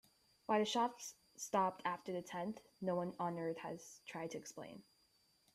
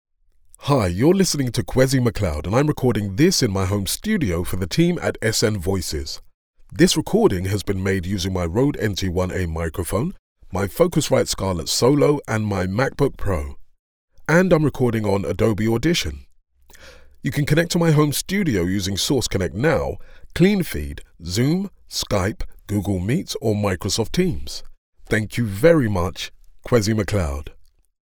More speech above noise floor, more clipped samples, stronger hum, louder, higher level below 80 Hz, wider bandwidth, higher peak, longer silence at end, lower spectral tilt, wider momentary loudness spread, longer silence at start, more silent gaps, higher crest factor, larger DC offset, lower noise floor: about the same, 34 dB vs 32 dB; neither; neither; second, -42 LUFS vs -21 LUFS; second, -84 dBFS vs -36 dBFS; second, 15.5 kHz vs over 20 kHz; second, -22 dBFS vs -2 dBFS; first, 0.75 s vs 0.4 s; about the same, -4.5 dB/octave vs -5.5 dB/octave; first, 15 LU vs 11 LU; about the same, 0.5 s vs 0.6 s; second, none vs 6.34-6.54 s, 10.19-10.36 s, 13.79-14.08 s, 24.78-24.93 s; about the same, 20 dB vs 20 dB; neither; first, -75 dBFS vs -52 dBFS